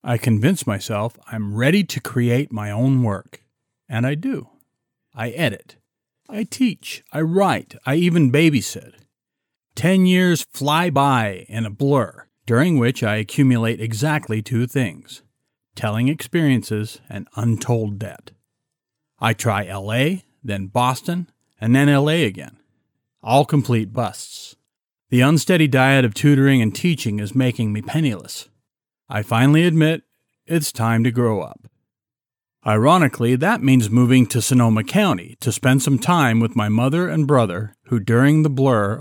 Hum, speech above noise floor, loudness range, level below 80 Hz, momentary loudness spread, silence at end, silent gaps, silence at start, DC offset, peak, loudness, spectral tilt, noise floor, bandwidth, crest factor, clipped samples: none; over 72 dB; 7 LU; -64 dBFS; 14 LU; 0 s; none; 0.05 s; under 0.1%; -2 dBFS; -19 LUFS; -6 dB/octave; under -90 dBFS; 19 kHz; 16 dB; under 0.1%